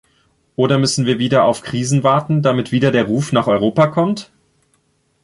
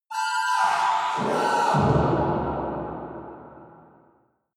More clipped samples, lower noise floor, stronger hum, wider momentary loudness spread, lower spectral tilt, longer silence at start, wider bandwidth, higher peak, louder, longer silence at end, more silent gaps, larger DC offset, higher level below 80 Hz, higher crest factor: neither; about the same, -62 dBFS vs -63 dBFS; neither; second, 6 LU vs 16 LU; about the same, -6 dB/octave vs -5.5 dB/octave; first, 0.6 s vs 0.1 s; second, 11.5 kHz vs 15 kHz; first, -2 dBFS vs -10 dBFS; first, -16 LUFS vs -23 LUFS; first, 1 s vs 0.85 s; neither; neither; second, -54 dBFS vs -46 dBFS; about the same, 14 dB vs 16 dB